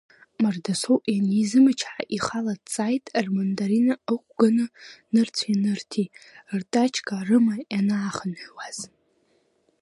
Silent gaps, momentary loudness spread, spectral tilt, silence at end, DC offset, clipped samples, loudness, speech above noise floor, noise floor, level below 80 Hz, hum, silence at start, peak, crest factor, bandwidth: none; 12 LU; -5.5 dB/octave; 0.95 s; under 0.1%; under 0.1%; -24 LUFS; 43 dB; -67 dBFS; -68 dBFS; none; 0.4 s; -6 dBFS; 18 dB; 11.5 kHz